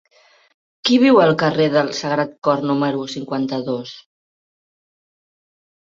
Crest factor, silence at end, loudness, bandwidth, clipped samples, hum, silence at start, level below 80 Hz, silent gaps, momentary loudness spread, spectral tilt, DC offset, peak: 18 dB; 1.85 s; -18 LUFS; 7.6 kHz; under 0.1%; none; 0.85 s; -64 dBFS; 2.38-2.42 s; 13 LU; -5.5 dB/octave; under 0.1%; -2 dBFS